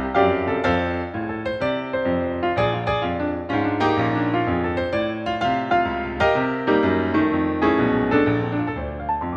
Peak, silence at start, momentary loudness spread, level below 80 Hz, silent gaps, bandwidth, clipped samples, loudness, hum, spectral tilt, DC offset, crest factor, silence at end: -6 dBFS; 0 s; 6 LU; -42 dBFS; none; 7.6 kHz; under 0.1%; -22 LUFS; none; -7.5 dB/octave; under 0.1%; 16 dB; 0 s